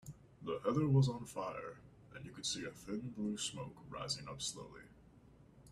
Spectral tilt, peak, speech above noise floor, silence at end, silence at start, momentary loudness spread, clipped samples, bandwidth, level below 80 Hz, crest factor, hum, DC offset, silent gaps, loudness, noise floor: -5 dB/octave; -20 dBFS; 23 dB; 0 s; 0.05 s; 21 LU; under 0.1%; 13.5 kHz; -66 dBFS; 20 dB; none; under 0.1%; none; -40 LUFS; -63 dBFS